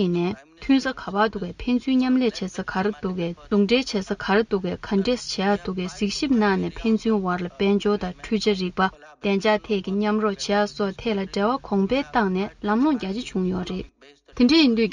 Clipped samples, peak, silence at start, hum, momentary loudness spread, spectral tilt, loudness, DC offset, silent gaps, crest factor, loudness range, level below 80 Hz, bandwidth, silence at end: under 0.1%; -6 dBFS; 0 s; none; 7 LU; -5.5 dB/octave; -23 LUFS; under 0.1%; none; 16 dB; 1 LU; -48 dBFS; 10 kHz; 0 s